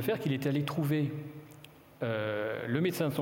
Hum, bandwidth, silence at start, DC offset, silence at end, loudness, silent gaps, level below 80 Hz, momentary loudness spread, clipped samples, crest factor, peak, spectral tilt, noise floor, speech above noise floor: none; 17 kHz; 0 s; under 0.1%; 0 s; -32 LUFS; none; -72 dBFS; 17 LU; under 0.1%; 18 dB; -16 dBFS; -6.5 dB/octave; -54 dBFS; 22 dB